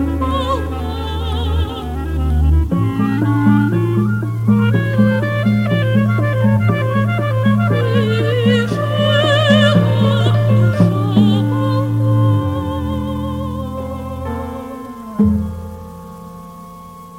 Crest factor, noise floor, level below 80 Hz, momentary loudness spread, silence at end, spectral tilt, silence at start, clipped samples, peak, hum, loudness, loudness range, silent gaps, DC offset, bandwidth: 14 dB; -35 dBFS; -28 dBFS; 13 LU; 0 s; -7.5 dB/octave; 0 s; under 0.1%; 0 dBFS; none; -16 LUFS; 8 LU; none; under 0.1%; 13 kHz